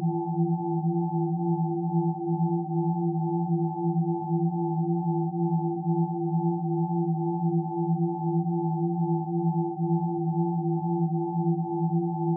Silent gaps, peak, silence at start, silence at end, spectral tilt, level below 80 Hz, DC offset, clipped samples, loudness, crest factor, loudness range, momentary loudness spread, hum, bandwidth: none; -16 dBFS; 0 s; 0 s; -5.5 dB/octave; -78 dBFS; under 0.1%; under 0.1%; -27 LUFS; 12 dB; 0 LU; 1 LU; none; 1 kHz